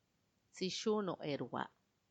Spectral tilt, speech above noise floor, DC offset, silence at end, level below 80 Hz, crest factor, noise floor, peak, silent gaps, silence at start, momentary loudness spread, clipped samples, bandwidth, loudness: -4.5 dB/octave; 40 dB; under 0.1%; 0.45 s; -84 dBFS; 18 dB; -80 dBFS; -24 dBFS; none; 0.55 s; 10 LU; under 0.1%; 9 kHz; -41 LUFS